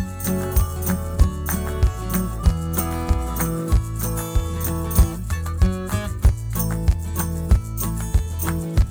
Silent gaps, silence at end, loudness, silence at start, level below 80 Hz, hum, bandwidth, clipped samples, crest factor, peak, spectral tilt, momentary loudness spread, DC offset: none; 0 s; -23 LUFS; 0 s; -24 dBFS; none; 18.5 kHz; under 0.1%; 18 dB; -2 dBFS; -6 dB/octave; 4 LU; under 0.1%